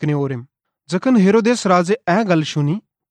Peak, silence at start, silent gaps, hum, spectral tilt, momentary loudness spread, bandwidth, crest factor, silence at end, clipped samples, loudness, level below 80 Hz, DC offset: -2 dBFS; 0 s; none; none; -6.5 dB/octave; 12 LU; 9.6 kHz; 14 dB; 0.3 s; under 0.1%; -17 LUFS; -64 dBFS; under 0.1%